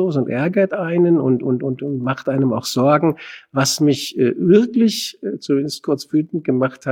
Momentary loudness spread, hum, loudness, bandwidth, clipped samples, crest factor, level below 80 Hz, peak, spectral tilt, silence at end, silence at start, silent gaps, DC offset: 8 LU; none; -18 LUFS; 17.5 kHz; under 0.1%; 16 dB; -62 dBFS; -2 dBFS; -5.5 dB/octave; 0 s; 0 s; none; under 0.1%